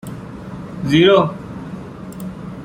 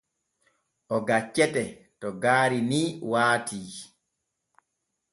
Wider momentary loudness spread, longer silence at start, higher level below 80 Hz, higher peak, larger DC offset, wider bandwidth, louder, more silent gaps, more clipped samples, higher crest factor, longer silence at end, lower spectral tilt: first, 20 LU vs 15 LU; second, 0.05 s vs 0.9 s; first, -46 dBFS vs -68 dBFS; first, -2 dBFS vs -8 dBFS; neither; first, 16.5 kHz vs 11.5 kHz; first, -14 LUFS vs -25 LUFS; neither; neither; about the same, 18 dB vs 20 dB; second, 0 s vs 1.25 s; first, -6.5 dB/octave vs -4.5 dB/octave